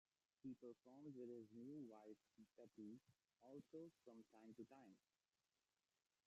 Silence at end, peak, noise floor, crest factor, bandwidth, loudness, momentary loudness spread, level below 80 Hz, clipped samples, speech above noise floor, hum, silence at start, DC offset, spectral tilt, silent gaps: 1.3 s; -48 dBFS; under -90 dBFS; 16 dB; 8 kHz; -62 LUFS; 9 LU; under -90 dBFS; under 0.1%; over 28 dB; none; 0.45 s; under 0.1%; -8 dB/octave; none